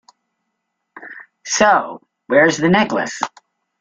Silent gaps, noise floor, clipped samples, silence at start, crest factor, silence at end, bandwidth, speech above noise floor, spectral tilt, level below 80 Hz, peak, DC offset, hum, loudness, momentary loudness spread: none; -75 dBFS; under 0.1%; 0.95 s; 18 dB; 0.5 s; 9.4 kHz; 60 dB; -4 dB/octave; -58 dBFS; -2 dBFS; under 0.1%; none; -16 LUFS; 22 LU